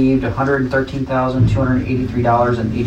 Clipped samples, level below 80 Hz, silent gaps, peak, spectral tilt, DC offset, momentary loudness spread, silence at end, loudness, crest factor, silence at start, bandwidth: under 0.1%; -32 dBFS; none; -4 dBFS; -8.5 dB/octave; under 0.1%; 4 LU; 0 s; -17 LUFS; 12 dB; 0 s; 8.4 kHz